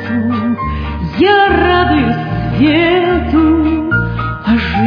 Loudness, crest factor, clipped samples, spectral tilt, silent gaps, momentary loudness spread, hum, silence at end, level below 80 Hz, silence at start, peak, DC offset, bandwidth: -12 LUFS; 12 dB; under 0.1%; -8.5 dB/octave; none; 9 LU; none; 0 s; -26 dBFS; 0 s; 0 dBFS; under 0.1%; 5.2 kHz